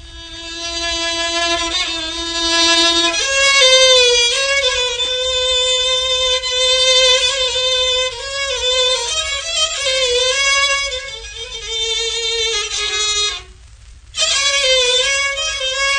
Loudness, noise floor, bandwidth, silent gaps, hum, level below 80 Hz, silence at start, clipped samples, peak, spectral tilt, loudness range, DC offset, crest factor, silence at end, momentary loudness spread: -13 LUFS; -40 dBFS; 9.6 kHz; none; none; -40 dBFS; 0 s; under 0.1%; 0 dBFS; 0.5 dB/octave; 5 LU; under 0.1%; 16 dB; 0 s; 11 LU